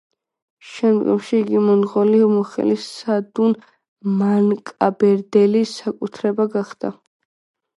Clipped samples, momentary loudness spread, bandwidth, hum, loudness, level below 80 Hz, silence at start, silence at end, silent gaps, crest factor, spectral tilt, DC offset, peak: under 0.1%; 11 LU; 11.5 kHz; none; -18 LUFS; -68 dBFS; 0.65 s; 0.85 s; 3.88-3.96 s; 18 dB; -7.5 dB/octave; under 0.1%; 0 dBFS